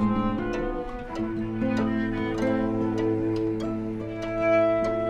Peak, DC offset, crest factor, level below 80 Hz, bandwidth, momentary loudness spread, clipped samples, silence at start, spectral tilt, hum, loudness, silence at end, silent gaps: -12 dBFS; under 0.1%; 14 dB; -42 dBFS; 9 kHz; 9 LU; under 0.1%; 0 s; -8 dB/octave; none; -27 LUFS; 0 s; none